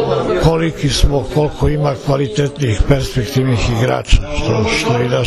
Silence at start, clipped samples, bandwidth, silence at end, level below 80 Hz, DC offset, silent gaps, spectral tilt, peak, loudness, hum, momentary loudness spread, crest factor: 0 s; 0.2%; 14 kHz; 0 s; -22 dBFS; under 0.1%; none; -5.5 dB/octave; 0 dBFS; -15 LUFS; none; 3 LU; 14 dB